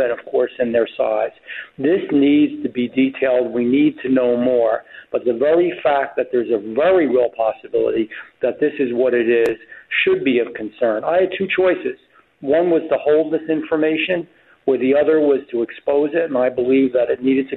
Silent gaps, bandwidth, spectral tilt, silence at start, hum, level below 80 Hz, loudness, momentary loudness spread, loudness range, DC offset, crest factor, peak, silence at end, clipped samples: none; 4.2 kHz; -7.5 dB/octave; 0 s; none; -60 dBFS; -18 LUFS; 8 LU; 1 LU; under 0.1%; 12 dB; -6 dBFS; 0 s; under 0.1%